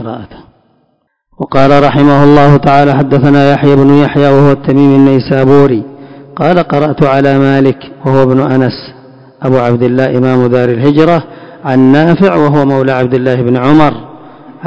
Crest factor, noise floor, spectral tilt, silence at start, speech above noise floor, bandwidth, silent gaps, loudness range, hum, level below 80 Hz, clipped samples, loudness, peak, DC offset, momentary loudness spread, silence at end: 8 dB; -58 dBFS; -9 dB/octave; 0 s; 51 dB; 8 kHz; none; 4 LU; none; -38 dBFS; 6%; -8 LUFS; 0 dBFS; 2%; 9 LU; 0 s